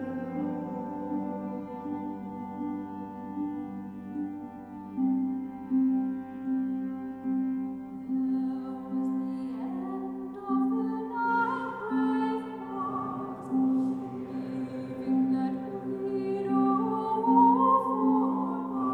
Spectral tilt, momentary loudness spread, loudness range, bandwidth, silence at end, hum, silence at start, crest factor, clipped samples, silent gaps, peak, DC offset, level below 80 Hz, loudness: -9 dB/octave; 12 LU; 10 LU; 4.5 kHz; 0 s; none; 0 s; 18 dB; under 0.1%; none; -12 dBFS; under 0.1%; -68 dBFS; -30 LUFS